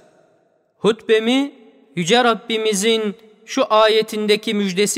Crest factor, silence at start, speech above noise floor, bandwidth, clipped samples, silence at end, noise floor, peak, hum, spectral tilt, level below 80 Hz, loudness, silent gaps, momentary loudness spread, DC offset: 16 dB; 0.85 s; 43 dB; 16 kHz; under 0.1%; 0 s; -60 dBFS; -2 dBFS; none; -3.5 dB/octave; -68 dBFS; -18 LUFS; none; 11 LU; under 0.1%